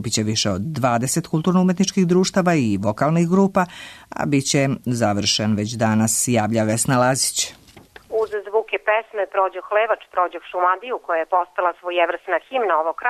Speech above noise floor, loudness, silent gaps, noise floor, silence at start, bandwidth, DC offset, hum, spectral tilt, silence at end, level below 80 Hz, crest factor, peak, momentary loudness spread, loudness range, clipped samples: 26 dB; -20 LUFS; none; -46 dBFS; 0 s; 13.5 kHz; under 0.1%; none; -4.5 dB/octave; 0 s; -56 dBFS; 14 dB; -6 dBFS; 6 LU; 3 LU; under 0.1%